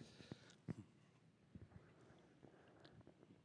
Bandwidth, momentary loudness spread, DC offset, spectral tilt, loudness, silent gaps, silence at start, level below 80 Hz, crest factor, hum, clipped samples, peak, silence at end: 10 kHz; 13 LU; under 0.1%; -6.5 dB/octave; -62 LUFS; none; 0 s; -78 dBFS; 26 dB; none; under 0.1%; -36 dBFS; 0 s